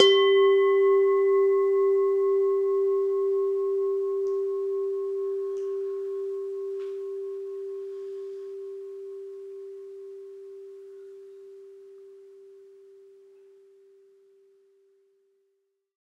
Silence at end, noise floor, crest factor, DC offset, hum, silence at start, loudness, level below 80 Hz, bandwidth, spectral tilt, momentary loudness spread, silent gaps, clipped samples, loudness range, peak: 3.45 s; -75 dBFS; 22 dB; under 0.1%; none; 0 s; -25 LUFS; -88 dBFS; 7 kHz; -2.5 dB/octave; 23 LU; none; under 0.1%; 23 LU; -4 dBFS